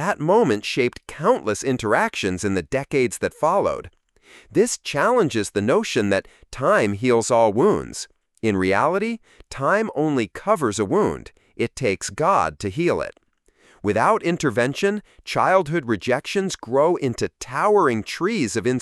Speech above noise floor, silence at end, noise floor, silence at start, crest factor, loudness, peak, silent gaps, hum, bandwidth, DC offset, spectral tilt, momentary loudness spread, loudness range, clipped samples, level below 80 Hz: 37 dB; 0 s; -58 dBFS; 0 s; 18 dB; -21 LUFS; -4 dBFS; none; none; 13 kHz; under 0.1%; -5 dB/octave; 8 LU; 2 LU; under 0.1%; -52 dBFS